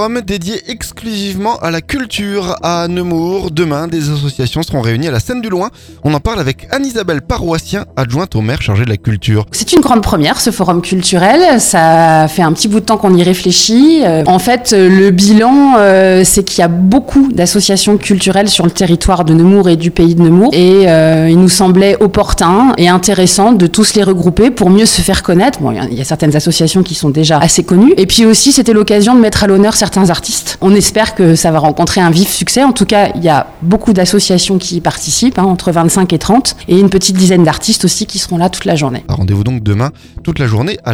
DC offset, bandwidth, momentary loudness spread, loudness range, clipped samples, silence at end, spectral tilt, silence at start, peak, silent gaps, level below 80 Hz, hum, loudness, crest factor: under 0.1%; 16.5 kHz; 9 LU; 8 LU; 0.6%; 0 s; -5 dB/octave; 0 s; 0 dBFS; none; -30 dBFS; none; -9 LUFS; 8 dB